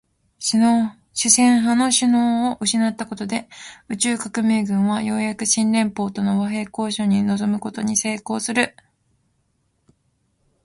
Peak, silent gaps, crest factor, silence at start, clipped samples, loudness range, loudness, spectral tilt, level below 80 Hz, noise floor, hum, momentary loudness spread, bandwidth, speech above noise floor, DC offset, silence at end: -2 dBFS; none; 20 dB; 0.4 s; under 0.1%; 5 LU; -20 LUFS; -3.5 dB/octave; -60 dBFS; -67 dBFS; none; 10 LU; 11.5 kHz; 48 dB; under 0.1%; 1.95 s